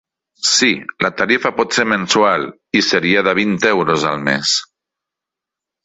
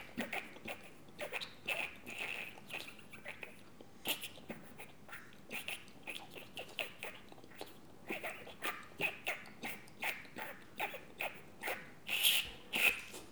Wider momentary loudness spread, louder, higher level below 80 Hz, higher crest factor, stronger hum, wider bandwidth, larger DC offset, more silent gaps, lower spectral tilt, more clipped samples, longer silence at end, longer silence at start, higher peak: second, 5 LU vs 20 LU; first, -15 LUFS vs -40 LUFS; first, -56 dBFS vs -72 dBFS; second, 16 dB vs 30 dB; neither; second, 8.4 kHz vs over 20 kHz; second, under 0.1% vs 0.1%; neither; first, -3 dB/octave vs -1 dB/octave; neither; first, 1.2 s vs 0 s; first, 0.4 s vs 0 s; first, 0 dBFS vs -14 dBFS